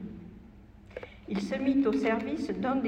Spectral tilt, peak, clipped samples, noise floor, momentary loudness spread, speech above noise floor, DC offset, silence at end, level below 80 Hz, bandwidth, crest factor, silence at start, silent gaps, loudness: -7 dB/octave; -16 dBFS; under 0.1%; -52 dBFS; 20 LU; 23 dB; under 0.1%; 0 s; -56 dBFS; 9.2 kHz; 16 dB; 0 s; none; -30 LUFS